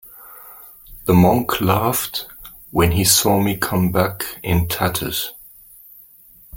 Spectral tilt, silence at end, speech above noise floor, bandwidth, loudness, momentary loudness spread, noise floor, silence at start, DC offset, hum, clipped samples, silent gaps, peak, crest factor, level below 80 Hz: -4.5 dB/octave; 0 s; 30 dB; 17 kHz; -18 LUFS; 24 LU; -47 dBFS; 0.05 s; under 0.1%; none; under 0.1%; none; 0 dBFS; 20 dB; -40 dBFS